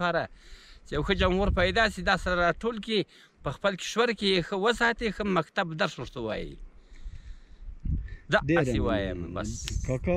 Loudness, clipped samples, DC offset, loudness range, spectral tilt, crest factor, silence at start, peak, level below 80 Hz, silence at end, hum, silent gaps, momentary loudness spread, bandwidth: -28 LUFS; under 0.1%; under 0.1%; 5 LU; -5 dB/octave; 20 dB; 0 s; -8 dBFS; -40 dBFS; 0 s; none; none; 12 LU; 13.5 kHz